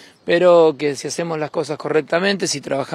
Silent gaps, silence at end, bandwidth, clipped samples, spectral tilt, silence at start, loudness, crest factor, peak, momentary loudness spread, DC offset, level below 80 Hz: none; 0 s; 13 kHz; under 0.1%; -4 dB/octave; 0.25 s; -18 LUFS; 16 dB; -2 dBFS; 11 LU; under 0.1%; -66 dBFS